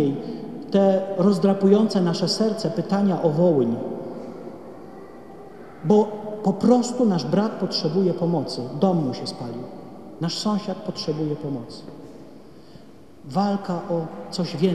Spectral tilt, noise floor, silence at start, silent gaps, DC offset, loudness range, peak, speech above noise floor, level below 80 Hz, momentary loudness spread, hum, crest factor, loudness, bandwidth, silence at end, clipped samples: -7 dB/octave; -47 dBFS; 0 s; none; 0.4%; 9 LU; -4 dBFS; 25 dB; -64 dBFS; 21 LU; none; 18 dB; -22 LUFS; 12 kHz; 0 s; under 0.1%